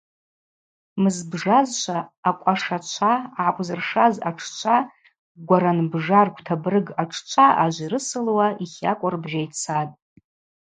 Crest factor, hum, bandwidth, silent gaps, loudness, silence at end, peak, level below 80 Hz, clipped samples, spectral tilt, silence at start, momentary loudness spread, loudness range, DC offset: 20 dB; none; 9.4 kHz; 2.17-2.23 s, 5.19-5.35 s; -22 LUFS; 0.7 s; -2 dBFS; -70 dBFS; under 0.1%; -5 dB/octave; 0.95 s; 9 LU; 2 LU; under 0.1%